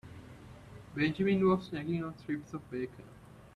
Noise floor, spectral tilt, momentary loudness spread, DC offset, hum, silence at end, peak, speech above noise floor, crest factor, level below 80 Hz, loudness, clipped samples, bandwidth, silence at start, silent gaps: -51 dBFS; -8 dB/octave; 23 LU; under 0.1%; none; 0.1 s; -18 dBFS; 19 dB; 18 dB; -62 dBFS; -33 LUFS; under 0.1%; 10.5 kHz; 0.05 s; none